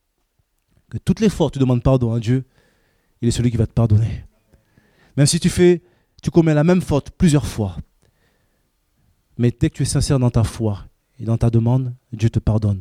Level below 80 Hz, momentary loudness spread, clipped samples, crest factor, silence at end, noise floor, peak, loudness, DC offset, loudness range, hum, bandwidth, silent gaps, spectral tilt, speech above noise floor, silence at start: -36 dBFS; 11 LU; under 0.1%; 18 dB; 0 s; -67 dBFS; -2 dBFS; -18 LUFS; under 0.1%; 4 LU; none; 15 kHz; none; -6.5 dB/octave; 50 dB; 0.95 s